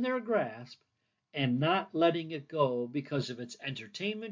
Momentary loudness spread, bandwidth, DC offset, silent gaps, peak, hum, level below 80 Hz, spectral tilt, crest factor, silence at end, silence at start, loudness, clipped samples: 11 LU; 7.6 kHz; under 0.1%; none; -16 dBFS; none; -82 dBFS; -6.5 dB/octave; 18 dB; 0 s; 0 s; -33 LUFS; under 0.1%